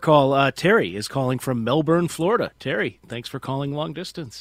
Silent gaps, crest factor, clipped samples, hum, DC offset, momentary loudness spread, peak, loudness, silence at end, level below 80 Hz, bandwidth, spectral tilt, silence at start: none; 20 dB; under 0.1%; none; under 0.1%; 13 LU; -2 dBFS; -22 LUFS; 0 s; -56 dBFS; 16 kHz; -6 dB/octave; 0 s